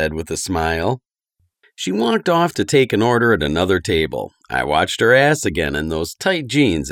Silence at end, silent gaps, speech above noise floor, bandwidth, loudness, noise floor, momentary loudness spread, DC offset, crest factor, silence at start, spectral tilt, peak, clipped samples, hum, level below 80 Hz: 0 s; none; 50 dB; 17 kHz; -17 LUFS; -67 dBFS; 10 LU; under 0.1%; 16 dB; 0 s; -4.5 dB/octave; 0 dBFS; under 0.1%; none; -40 dBFS